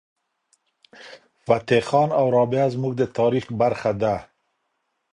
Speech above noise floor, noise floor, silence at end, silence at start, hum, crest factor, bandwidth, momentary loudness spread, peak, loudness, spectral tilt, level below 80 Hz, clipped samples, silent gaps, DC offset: 53 dB; -74 dBFS; 0.9 s; 1 s; none; 18 dB; 10.5 kHz; 5 LU; -4 dBFS; -21 LUFS; -7 dB/octave; -56 dBFS; under 0.1%; none; under 0.1%